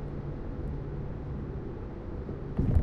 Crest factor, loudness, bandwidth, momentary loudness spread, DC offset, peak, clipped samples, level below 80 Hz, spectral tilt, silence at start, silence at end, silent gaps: 20 dB; -37 LUFS; 5.2 kHz; 7 LU; under 0.1%; -12 dBFS; under 0.1%; -36 dBFS; -10.5 dB/octave; 0 s; 0 s; none